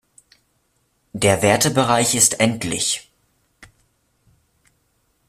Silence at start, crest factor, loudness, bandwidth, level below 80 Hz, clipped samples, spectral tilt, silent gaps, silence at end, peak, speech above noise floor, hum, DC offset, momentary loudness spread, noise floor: 1.15 s; 22 dB; -17 LUFS; 15.5 kHz; -54 dBFS; under 0.1%; -3 dB/octave; none; 1.65 s; 0 dBFS; 49 dB; none; under 0.1%; 7 LU; -66 dBFS